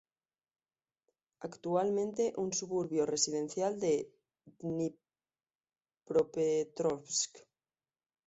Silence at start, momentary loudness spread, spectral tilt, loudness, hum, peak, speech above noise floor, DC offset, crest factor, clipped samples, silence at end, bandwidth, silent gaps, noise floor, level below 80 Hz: 1.4 s; 9 LU; -5 dB/octave; -34 LUFS; none; -16 dBFS; over 56 dB; under 0.1%; 20 dB; under 0.1%; 0.9 s; 8 kHz; 5.55-5.59 s; under -90 dBFS; -76 dBFS